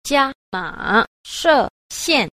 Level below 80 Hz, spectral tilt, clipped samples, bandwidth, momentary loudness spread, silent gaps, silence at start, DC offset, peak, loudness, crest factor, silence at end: -48 dBFS; -2.5 dB/octave; under 0.1%; 15.5 kHz; 10 LU; 0.35-0.52 s, 1.07-1.24 s, 1.70-1.90 s; 0.05 s; under 0.1%; -2 dBFS; -19 LUFS; 16 dB; 0.05 s